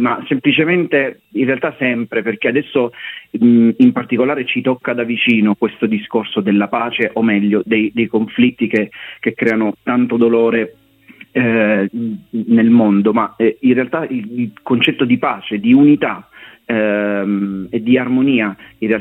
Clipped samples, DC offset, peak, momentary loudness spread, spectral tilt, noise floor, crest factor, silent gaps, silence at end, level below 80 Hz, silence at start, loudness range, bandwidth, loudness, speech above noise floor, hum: under 0.1%; under 0.1%; 0 dBFS; 10 LU; -8.5 dB/octave; -43 dBFS; 14 dB; none; 0 s; -58 dBFS; 0 s; 2 LU; 4 kHz; -15 LUFS; 28 dB; none